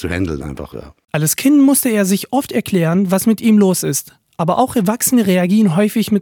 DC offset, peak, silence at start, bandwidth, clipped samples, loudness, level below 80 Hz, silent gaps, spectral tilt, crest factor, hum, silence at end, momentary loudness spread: under 0.1%; 0 dBFS; 0 s; 19 kHz; under 0.1%; -14 LUFS; -44 dBFS; none; -5 dB/octave; 14 dB; none; 0 s; 12 LU